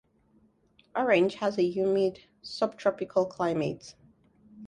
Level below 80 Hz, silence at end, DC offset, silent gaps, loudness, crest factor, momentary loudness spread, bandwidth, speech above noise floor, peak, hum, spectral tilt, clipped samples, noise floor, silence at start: -68 dBFS; 0 s; under 0.1%; none; -28 LUFS; 20 dB; 16 LU; 10 kHz; 37 dB; -10 dBFS; none; -6 dB/octave; under 0.1%; -65 dBFS; 0.95 s